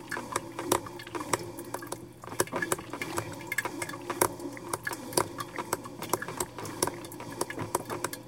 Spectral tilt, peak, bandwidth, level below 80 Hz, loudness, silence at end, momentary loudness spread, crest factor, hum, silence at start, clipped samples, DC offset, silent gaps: -3 dB/octave; -6 dBFS; 17 kHz; -62 dBFS; -34 LUFS; 0 s; 10 LU; 28 dB; none; 0 s; under 0.1%; under 0.1%; none